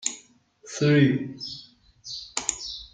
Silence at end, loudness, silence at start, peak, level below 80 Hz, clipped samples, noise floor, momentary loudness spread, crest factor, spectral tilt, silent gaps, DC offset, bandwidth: 0.05 s; -25 LUFS; 0 s; -4 dBFS; -60 dBFS; under 0.1%; -54 dBFS; 21 LU; 22 dB; -4.5 dB/octave; none; under 0.1%; 9.6 kHz